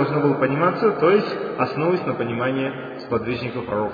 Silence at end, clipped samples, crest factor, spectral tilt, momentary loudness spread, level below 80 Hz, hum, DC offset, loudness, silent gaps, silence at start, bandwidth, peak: 0 s; under 0.1%; 16 dB; -9 dB/octave; 8 LU; -56 dBFS; none; under 0.1%; -21 LUFS; none; 0 s; 5 kHz; -6 dBFS